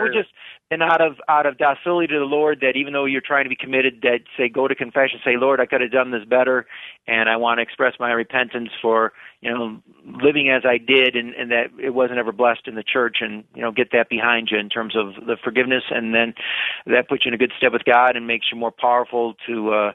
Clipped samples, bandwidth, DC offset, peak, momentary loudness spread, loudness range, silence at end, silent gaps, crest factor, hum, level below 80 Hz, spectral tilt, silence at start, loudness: under 0.1%; 4.1 kHz; under 0.1%; -2 dBFS; 8 LU; 2 LU; 0 s; none; 18 dB; none; -66 dBFS; -7 dB/octave; 0 s; -19 LUFS